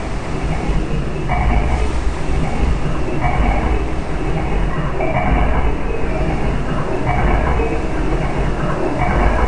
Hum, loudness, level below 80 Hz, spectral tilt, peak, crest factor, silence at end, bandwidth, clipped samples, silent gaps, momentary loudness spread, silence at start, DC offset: none; -20 LUFS; -20 dBFS; -7 dB/octave; 0 dBFS; 16 dB; 0 s; 9.8 kHz; under 0.1%; none; 5 LU; 0 s; 1%